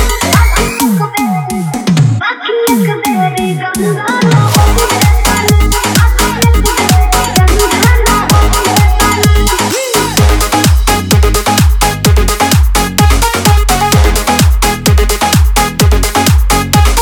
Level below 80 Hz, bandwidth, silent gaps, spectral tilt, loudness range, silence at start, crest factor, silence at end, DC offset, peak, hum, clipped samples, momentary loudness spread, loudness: -12 dBFS; over 20 kHz; none; -4.5 dB/octave; 2 LU; 0 s; 8 dB; 0 s; under 0.1%; 0 dBFS; none; 0.1%; 4 LU; -9 LUFS